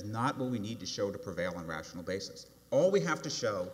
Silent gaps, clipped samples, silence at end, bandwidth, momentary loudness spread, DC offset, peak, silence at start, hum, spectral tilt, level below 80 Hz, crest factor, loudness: none; under 0.1%; 0 s; 16 kHz; 12 LU; under 0.1%; -16 dBFS; 0 s; none; -5 dB/octave; -66 dBFS; 18 dB; -34 LUFS